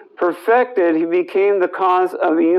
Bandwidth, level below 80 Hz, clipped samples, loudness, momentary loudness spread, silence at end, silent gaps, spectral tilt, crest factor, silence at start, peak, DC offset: 12.5 kHz; -84 dBFS; under 0.1%; -17 LUFS; 2 LU; 0 s; none; -6.5 dB/octave; 10 dB; 0.2 s; -6 dBFS; under 0.1%